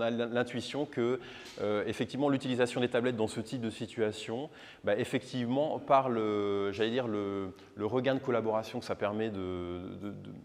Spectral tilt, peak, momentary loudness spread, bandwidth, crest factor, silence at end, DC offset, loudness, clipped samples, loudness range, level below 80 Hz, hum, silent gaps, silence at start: -6 dB/octave; -14 dBFS; 9 LU; 14.5 kHz; 20 dB; 0 s; under 0.1%; -33 LUFS; under 0.1%; 2 LU; -70 dBFS; none; none; 0 s